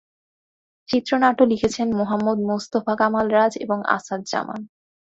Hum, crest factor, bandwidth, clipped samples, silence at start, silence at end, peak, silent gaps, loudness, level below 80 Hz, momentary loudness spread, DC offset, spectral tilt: none; 20 dB; 8 kHz; under 0.1%; 0.9 s; 0.45 s; -2 dBFS; none; -21 LUFS; -58 dBFS; 8 LU; under 0.1%; -5 dB/octave